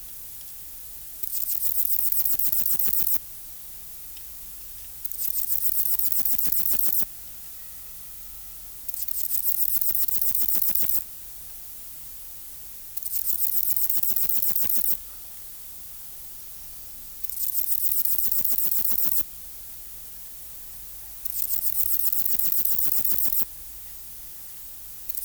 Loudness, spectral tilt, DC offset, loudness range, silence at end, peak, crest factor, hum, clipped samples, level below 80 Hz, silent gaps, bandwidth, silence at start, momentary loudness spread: -21 LUFS; -0.5 dB/octave; under 0.1%; 4 LU; 0 s; -8 dBFS; 18 dB; none; under 0.1%; -54 dBFS; none; over 20 kHz; 0 s; 17 LU